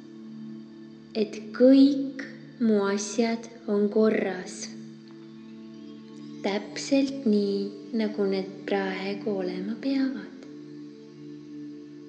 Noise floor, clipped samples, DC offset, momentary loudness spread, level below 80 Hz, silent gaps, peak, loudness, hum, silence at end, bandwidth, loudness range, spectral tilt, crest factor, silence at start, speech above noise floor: -46 dBFS; under 0.1%; under 0.1%; 21 LU; -78 dBFS; none; -8 dBFS; -26 LUFS; none; 0 s; 9 kHz; 7 LU; -5.5 dB/octave; 20 dB; 0 s; 20 dB